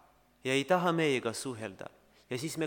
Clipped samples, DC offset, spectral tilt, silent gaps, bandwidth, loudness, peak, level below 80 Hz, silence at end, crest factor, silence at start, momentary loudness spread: under 0.1%; under 0.1%; -4.5 dB/octave; none; 19 kHz; -32 LUFS; -14 dBFS; -74 dBFS; 0 s; 20 dB; 0.45 s; 15 LU